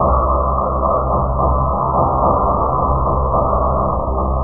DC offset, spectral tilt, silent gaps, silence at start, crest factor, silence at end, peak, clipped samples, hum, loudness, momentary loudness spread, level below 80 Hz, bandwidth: under 0.1%; -17 dB/octave; none; 0 s; 14 dB; 0 s; -2 dBFS; under 0.1%; none; -16 LUFS; 3 LU; -22 dBFS; 1.6 kHz